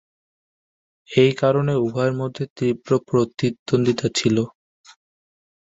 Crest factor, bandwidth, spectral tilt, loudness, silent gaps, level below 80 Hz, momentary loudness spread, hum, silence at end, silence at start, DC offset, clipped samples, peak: 20 dB; 8 kHz; -6 dB/octave; -21 LUFS; 2.50-2.56 s, 3.59-3.66 s; -58 dBFS; 7 LU; none; 1.1 s; 1.1 s; under 0.1%; under 0.1%; -2 dBFS